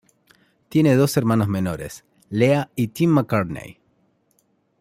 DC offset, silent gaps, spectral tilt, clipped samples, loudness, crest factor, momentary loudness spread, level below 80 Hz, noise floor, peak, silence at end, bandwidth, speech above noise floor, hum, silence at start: under 0.1%; none; -7 dB/octave; under 0.1%; -20 LUFS; 18 dB; 17 LU; -54 dBFS; -65 dBFS; -4 dBFS; 1.1 s; 16 kHz; 46 dB; none; 0.7 s